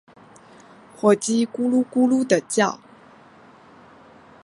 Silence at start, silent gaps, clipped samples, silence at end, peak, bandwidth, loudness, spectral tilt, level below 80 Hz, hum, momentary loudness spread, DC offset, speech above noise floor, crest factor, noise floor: 1.05 s; none; under 0.1%; 1.7 s; -4 dBFS; 11.5 kHz; -20 LUFS; -4.5 dB/octave; -70 dBFS; none; 4 LU; under 0.1%; 30 dB; 20 dB; -49 dBFS